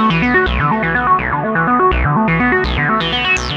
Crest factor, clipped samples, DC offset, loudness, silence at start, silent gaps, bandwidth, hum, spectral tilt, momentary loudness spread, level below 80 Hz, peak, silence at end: 14 dB; under 0.1%; under 0.1%; -14 LUFS; 0 s; none; 8.6 kHz; none; -5.5 dB/octave; 2 LU; -26 dBFS; 0 dBFS; 0 s